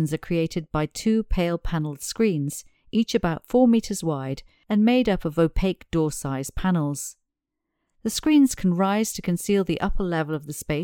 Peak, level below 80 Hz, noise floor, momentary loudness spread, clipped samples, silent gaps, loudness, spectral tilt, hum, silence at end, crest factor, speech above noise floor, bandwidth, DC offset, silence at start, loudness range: -8 dBFS; -38 dBFS; -82 dBFS; 10 LU; under 0.1%; none; -24 LUFS; -5.5 dB/octave; none; 0 s; 16 dB; 59 dB; 18.5 kHz; under 0.1%; 0 s; 3 LU